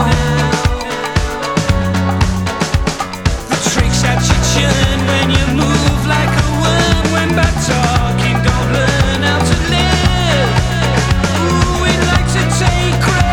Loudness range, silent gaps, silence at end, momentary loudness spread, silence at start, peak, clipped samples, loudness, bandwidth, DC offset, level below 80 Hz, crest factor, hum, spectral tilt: 3 LU; none; 0 s; 4 LU; 0 s; 0 dBFS; under 0.1%; -13 LUFS; 18 kHz; under 0.1%; -20 dBFS; 12 dB; none; -4.5 dB/octave